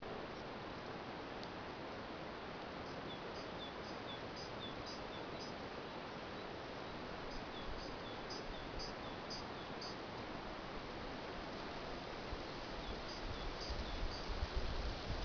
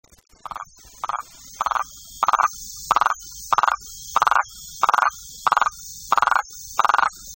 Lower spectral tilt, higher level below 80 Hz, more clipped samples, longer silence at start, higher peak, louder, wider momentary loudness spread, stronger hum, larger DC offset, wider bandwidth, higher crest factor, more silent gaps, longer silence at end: first, -3 dB/octave vs 0 dB/octave; about the same, -52 dBFS vs -54 dBFS; neither; second, 0 s vs 0.5 s; second, -28 dBFS vs -4 dBFS; second, -47 LUFS vs -22 LUFS; second, 3 LU vs 16 LU; neither; neither; second, 5.4 kHz vs 16.5 kHz; about the same, 18 dB vs 20 dB; neither; about the same, 0 s vs 0 s